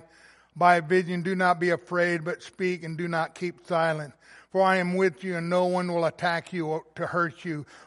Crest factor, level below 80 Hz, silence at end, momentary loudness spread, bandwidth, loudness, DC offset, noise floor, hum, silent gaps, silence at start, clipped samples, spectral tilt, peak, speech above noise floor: 22 dB; -72 dBFS; 0.05 s; 9 LU; 11.5 kHz; -26 LUFS; under 0.1%; -56 dBFS; none; none; 0.55 s; under 0.1%; -6.5 dB/octave; -6 dBFS; 30 dB